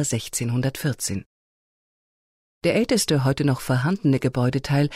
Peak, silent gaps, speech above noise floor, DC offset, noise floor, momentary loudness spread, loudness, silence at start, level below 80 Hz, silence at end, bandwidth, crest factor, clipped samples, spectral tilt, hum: -8 dBFS; 1.26-2.61 s; over 68 dB; under 0.1%; under -90 dBFS; 6 LU; -23 LUFS; 0 s; -50 dBFS; 0 s; 16 kHz; 14 dB; under 0.1%; -5.5 dB/octave; none